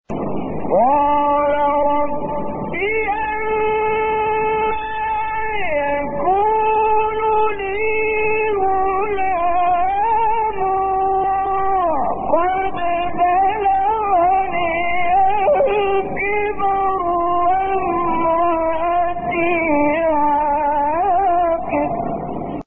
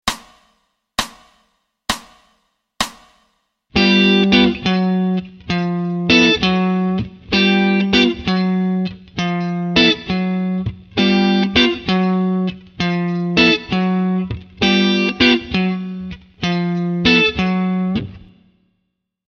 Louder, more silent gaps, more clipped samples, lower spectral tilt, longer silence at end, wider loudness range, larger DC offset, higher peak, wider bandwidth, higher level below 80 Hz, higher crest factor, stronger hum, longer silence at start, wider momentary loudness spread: about the same, -18 LUFS vs -16 LUFS; neither; neither; second, 0 dB/octave vs -5.5 dB/octave; second, 0.05 s vs 1.1 s; about the same, 2 LU vs 4 LU; neither; second, -4 dBFS vs 0 dBFS; second, 3.8 kHz vs 12.5 kHz; about the same, -40 dBFS vs -42 dBFS; about the same, 14 dB vs 18 dB; neither; about the same, 0.1 s vs 0.05 s; second, 5 LU vs 12 LU